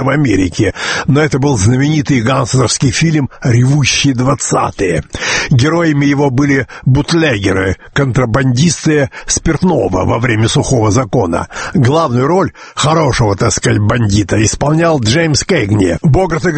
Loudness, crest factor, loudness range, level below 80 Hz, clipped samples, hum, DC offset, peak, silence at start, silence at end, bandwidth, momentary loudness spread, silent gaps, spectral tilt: -12 LUFS; 12 dB; 1 LU; -30 dBFS; under 0.1%; none; under 0.1%; 0 dBFS; 0 s; 0 s; 8.8 kHz; 4 LU; none; -5 dB/octave